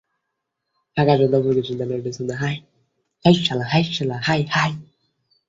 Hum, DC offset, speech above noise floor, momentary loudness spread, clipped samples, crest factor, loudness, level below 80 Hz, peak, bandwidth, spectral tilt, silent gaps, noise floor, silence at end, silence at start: none; under 0.1%; 59 dB; 10 LU; under 0.1%; 20 dB; -20 LUFS; -54 dBFS; -2 dBFS; 7.8 kHz; -6 dB/octave; none; -79 dBFS; 0.65 s; 0.95 s